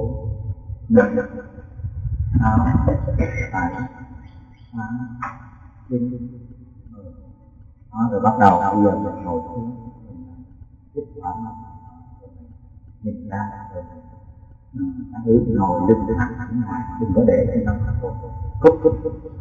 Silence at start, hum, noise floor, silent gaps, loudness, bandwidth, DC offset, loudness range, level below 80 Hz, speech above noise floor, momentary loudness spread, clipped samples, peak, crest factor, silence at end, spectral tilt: 0 s; none; -46 dBFS; none; -21 LUFS; 7.6 kHz; under 0.1%; 14 LU; -34 dBFS; 26 dB; 23 LU; under 0.1%; 0 dBFS; 22 dB; 0 s; -10 dB/octave